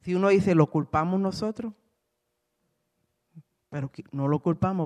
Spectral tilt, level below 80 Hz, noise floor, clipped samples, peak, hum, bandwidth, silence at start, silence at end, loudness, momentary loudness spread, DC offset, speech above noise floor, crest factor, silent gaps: -8 dB/octave; -58 dBFS; -79 dBFS; under 0.1%; -6 dBFS; none; 10.5 kHz; 0.05 s; 0 s; -26 LUFS; 15 LU; under 0.1%; 54 dB; 22 dB; none